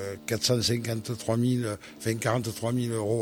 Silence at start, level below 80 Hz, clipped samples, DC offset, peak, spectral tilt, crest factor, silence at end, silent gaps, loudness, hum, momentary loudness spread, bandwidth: 0 s; -58 dBFS; under 0.1%; under 0.1%; -10 dBFS; -5 dB/octave; 18 dB; 0 s; none; -28 LUFS; none; 7 LU; 17 kHz